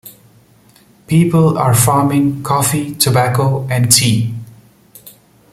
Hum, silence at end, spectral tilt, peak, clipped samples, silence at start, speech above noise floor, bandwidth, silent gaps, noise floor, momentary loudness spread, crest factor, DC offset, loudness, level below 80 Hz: none; 0.4 s; -4.5 dB/octave; 0 dBFS; under 0.1%; 0.05 s; 35 dB; 16.5 kHz; none; -48 dBFS; 6 LU; 14 dB; under 0.1%; -13 LUFS; -48 dBFS